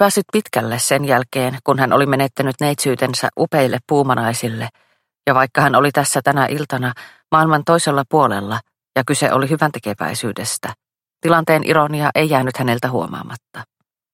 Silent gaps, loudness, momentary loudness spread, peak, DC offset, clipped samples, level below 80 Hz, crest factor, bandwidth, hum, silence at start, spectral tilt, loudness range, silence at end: none; -17 LUFS; 10 LU; 0 dBFS; under 0.1%; under 0.1%; -58 dBFS; 18 dB; 16.5 kHz; none; 0 s; -4.5 dB/octave; 3 LU; 0.5 s